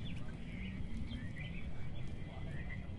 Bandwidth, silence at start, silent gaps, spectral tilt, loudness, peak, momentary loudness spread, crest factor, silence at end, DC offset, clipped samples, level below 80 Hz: 11 kHz; 0 s; none; -7 dB/octave; -46 LUFS; -30 dBFS; 2 LU; 12 dB; 0 s; under 0.1%; under 0.1%; -48 dBFS